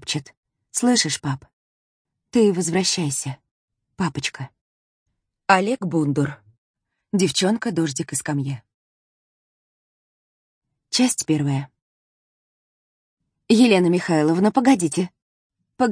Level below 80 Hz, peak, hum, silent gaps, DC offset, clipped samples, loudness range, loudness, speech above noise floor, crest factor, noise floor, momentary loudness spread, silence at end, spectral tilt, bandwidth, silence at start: -64 dBFS; 0 dBFS; none; 0.37-0.43 s, 1.53-2.05 s, 3.51-3.68 s, 4.61-5.06 s, 6.58-6.74 s, 8.74-10.62 s, 11.82-13.17 s, 15.22-15.50 s; under 0.1%; under 0.1%; 6 LU; -21 LUFS; over 70 dB; 22 dB; under -90 dBFS; 13 LU; 0 s; -4.5 dB/octave; 10.5 kHz; 0.05 s